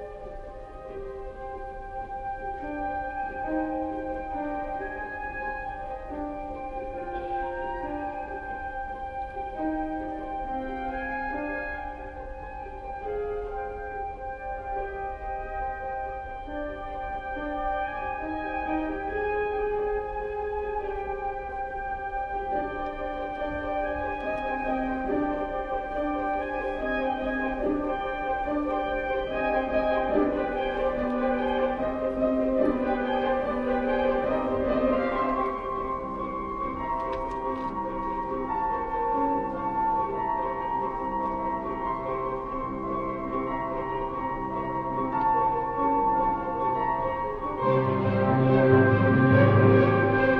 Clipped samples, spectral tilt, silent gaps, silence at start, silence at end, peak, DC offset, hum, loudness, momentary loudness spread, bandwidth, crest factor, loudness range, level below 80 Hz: under 0.1%; -9 dB/octave; none; 0 s; 0 s; -6 dBFS; under 0.1%; none; -28 LUFS; 11 LU; 6.6 kHz; 22 dB; 8 LU; -44 dBFS